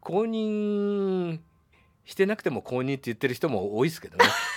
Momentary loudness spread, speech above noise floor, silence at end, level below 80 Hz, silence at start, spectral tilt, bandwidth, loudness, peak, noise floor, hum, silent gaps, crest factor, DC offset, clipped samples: 8 LU; 36 dB; 0 s; -68 dBFS; 0.05 s; -5 dB/octave; 18.5 kHz; -27 LUFS; -2 dBFS; -62 dBFS; none; none; 24 dB; under 0.1%; under 0.1%